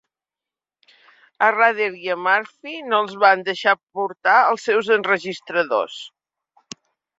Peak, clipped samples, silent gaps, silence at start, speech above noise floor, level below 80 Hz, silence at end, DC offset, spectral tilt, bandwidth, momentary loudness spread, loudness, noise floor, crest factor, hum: -2 dBFS; under 0.1%; none; 1.4 s; 70 dB; -74 dBFS; 1.1 s; under 0.1%; -3.5 dB/octave; 7.8 kHz; 19 LU; -19 LUFS; -89 dBFS; 20 dB; none